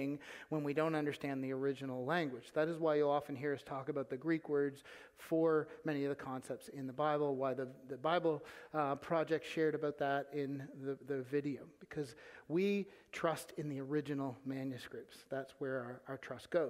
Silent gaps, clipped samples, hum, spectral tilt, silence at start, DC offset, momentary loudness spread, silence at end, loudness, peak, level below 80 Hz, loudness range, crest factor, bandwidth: none; under 0.1%; none; -6.5 dB/octave; 0 s; under 0.1%; 12 LU; 0 s; -39 LUFS; -20 dBFS; -80 dBFS; 3 LU; 18 dB; 16 kHz